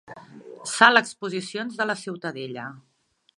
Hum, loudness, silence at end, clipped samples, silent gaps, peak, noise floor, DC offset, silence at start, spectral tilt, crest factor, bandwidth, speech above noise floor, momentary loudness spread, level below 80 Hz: none; -22 LUFS; 0.6 s; under 0.1%; none; 0 dBFS; -44 dBFS; under 0.1%; 0.1 s; -2.5 dB/octave; 26 dB; 11.5 kHz; 20 dB; 21 LU; -76 dBFS